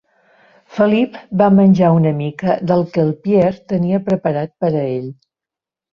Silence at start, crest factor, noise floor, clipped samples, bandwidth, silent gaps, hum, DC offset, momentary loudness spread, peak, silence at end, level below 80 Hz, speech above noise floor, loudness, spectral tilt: 0.7 s; 14 dB; -87 dBFS; under 0.1%; 6.4 kHz; none; none; under 0.1%; 9 LU; -2 dBFS; 0.8 s; -54 dBFS; 73 dB; -16 LUFS; -9.5 dB/octave